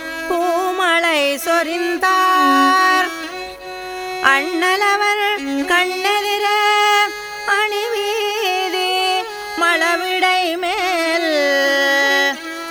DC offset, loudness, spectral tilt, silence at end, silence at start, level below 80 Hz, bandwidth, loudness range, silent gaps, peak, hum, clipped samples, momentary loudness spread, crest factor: under 0.1%; -16 LUFS; -0.5 dB/octave; 0 s; 0 s; -56 dBFS; over 20 kHz; 2 LU; none; 0 dBFS; none; under 0.1%; 9 LU; 16 dB